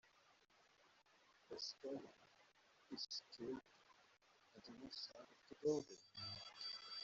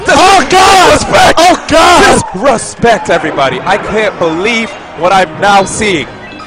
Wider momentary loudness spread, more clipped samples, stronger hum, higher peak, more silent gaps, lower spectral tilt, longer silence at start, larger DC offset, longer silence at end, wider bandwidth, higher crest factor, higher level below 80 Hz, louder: first, 19 LU vs 8 LU; second, under 0.1% vs 0.7%; neither; second, -30 dBFS vs 0 dBFS; neither; about the same, -3 dB/octave vs -3 dB/octave; about the same, 0.05 s vs 0 s; neither; about the same, 0 s vs 0 s; second, 8 kHz vs 17 kHz; first, 24 dB vs 8 dB; second, -86 dBFS vs -30 dBFS; second, -50 LUFS vs -7 LUFS